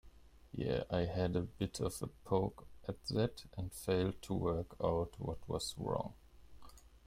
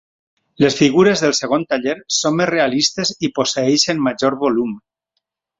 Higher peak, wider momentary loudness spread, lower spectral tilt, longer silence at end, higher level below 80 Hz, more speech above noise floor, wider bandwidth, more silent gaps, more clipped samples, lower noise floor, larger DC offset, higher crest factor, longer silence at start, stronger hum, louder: second, -20 dBFS vs 0 dBFS; first, 10 LU vs 7 LU; first, -6 dB/octave vs -3.5 dB/octave; second, 0.1 s vs 0.8 s; about the same, -56 dBFS vs -56 dBFS; second, 22 dB vs 58 dB; first, 16 kHz vs 7.8 kHz; neither; neither; second, -60 dBFS vs -75 dBFS; neither; about the same, 20 dB vs 16 dB; second, 0.05 s vs 0.6 s; neither; second, -39 LUFS vs -16 LUFS